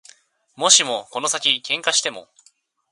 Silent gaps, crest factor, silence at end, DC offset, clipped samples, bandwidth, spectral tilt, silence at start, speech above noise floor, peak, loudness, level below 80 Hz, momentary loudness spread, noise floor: none; 22 dB; 0.7 s; under 0.1%; under 0.1%; 16 kHz; 1 dB/octave; 0.6 s; 39 dB; 0 dBFS; -18 LUFS; -76 dBFS; 10 LU; -59 dBFS